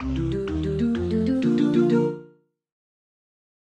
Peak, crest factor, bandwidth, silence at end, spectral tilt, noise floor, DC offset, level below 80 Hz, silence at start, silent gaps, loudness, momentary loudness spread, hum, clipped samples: -10 dBFS; 16 dB; 8.8 kHz; 1.55 s; -8.5 dB/octave; -54 dBFS; under 0.1%; -40 dBFS; 0 s; none; -23 LUFS; 7 LU; none; under 0.1%